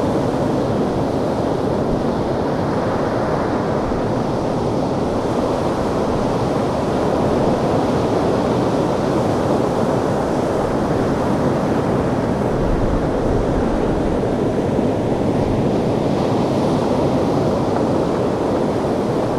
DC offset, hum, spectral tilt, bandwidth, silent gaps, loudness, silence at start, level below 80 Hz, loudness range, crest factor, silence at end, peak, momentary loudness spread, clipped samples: under 0.1%; none; -7.5 dB/octave; 14 kHz; none; -19 LUFS; 0 s; -32 dBFS; 2 LU; 14 dB; 0 s; -4 dBFS; 2 LU; under 0.1%